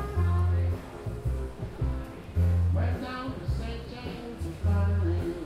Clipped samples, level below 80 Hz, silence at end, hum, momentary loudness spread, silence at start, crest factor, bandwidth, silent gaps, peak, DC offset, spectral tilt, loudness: under 0.1%; -36 dBFS; 0 s; none; 12 LU; 0 s; 12 dB; 8.8 kHz; none; -16 dBFS; under 0.1%; -8 dB/octave; -30 LUFS